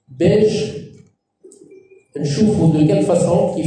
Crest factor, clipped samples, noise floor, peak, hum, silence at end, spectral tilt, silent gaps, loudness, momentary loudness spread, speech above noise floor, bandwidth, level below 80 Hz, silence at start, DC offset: 14 dB; under 0.1%; -49 dBFS; -4 dBFS; none; 0 s; -7 dB/octave; none; -16 LUFS; 12 LU; 35 dB; 10 kHz; -50 dBFS; 0.1 s; under 0.1%